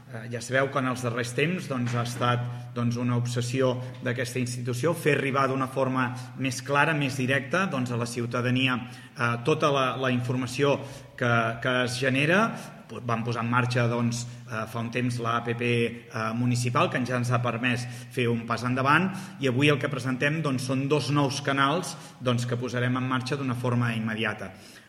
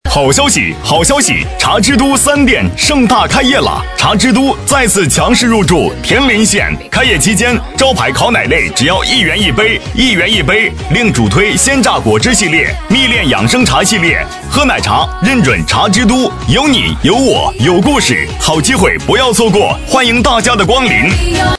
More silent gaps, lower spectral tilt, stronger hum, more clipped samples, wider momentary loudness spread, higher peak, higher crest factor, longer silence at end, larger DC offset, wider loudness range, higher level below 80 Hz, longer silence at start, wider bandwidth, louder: neither; first, -5.5 dB/octave vs -3.5 dB/octave; neither; second, under 0.1% vs 0.3%; first, 8 LU vs 3 LU; second, -6 dBFS vs 0 dBFS; first, 20 dB vs 10 dB; about the same, 0.05 s vs 0 s; neither; about the same, 2 LU vs 1 LU; second, -64 dBFS vs -24 dBFS; about the same, 0 s vs 0.05 s; first, 15 kHz vs 11 kHz; second, -27 LUFS vs -9 LUFS